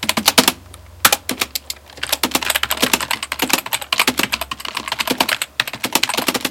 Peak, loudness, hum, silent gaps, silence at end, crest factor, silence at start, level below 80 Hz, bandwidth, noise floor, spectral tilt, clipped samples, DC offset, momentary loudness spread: 0 dBFS; -17 LUFS; none; none; 0 s; 20 dB; 0 s; -46 dBFS; over 20 kHz; -39 dBFS; -1 dB/octave; under 0.1%; under 0.1%; 9 LU